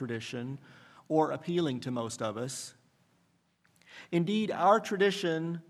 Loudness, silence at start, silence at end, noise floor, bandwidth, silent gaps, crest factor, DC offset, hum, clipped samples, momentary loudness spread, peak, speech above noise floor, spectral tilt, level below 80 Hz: -31 LUFS; 0 s; 0.1 s; -71 dBFS; 14.5 kHz; none; 22 dB; under 0.1%; none; under 0.1%; 15 LU; -10 dBFS; 40 dB; -5.5 dB/octave; -80 dBFS